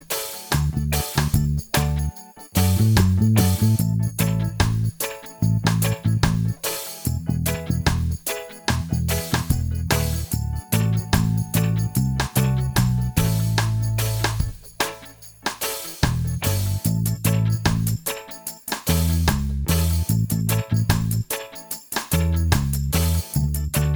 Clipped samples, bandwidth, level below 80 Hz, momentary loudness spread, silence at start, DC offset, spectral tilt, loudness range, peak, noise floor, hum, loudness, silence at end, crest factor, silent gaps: under 0.1%; over 20 kHz; -32 dBFS; 7 LU; 0 s; under 0.1%; -5 dB/octave; 4 LU; -2 dBFS; -43 dBFS; none; -22 LUFS; 0 s; 20 dB; none